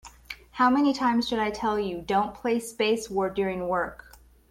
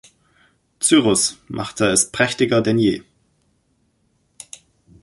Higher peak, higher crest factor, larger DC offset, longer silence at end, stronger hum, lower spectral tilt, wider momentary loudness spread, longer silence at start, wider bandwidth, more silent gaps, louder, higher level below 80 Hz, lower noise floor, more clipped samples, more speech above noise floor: second, -12 dBFS vs -2 dBFS; about the same, 16 dB vs 20 dB; neither; second, 0.55 s vs 2 s; neither; about the same, -4.5 dB/octave vs -3.5 dB/octave; second, 8 LU vs 18 LU; second, 0.05 s vs 0.8 s; first, 16 kHz vs 12 kHz; neither; second, -26 LUFS vs -18 LUFS; about the same, -54 dBFS vs -54 dBFS; second, -45 dBFS vs -65 dBFS; neither; second, 20 dB vs 47 dB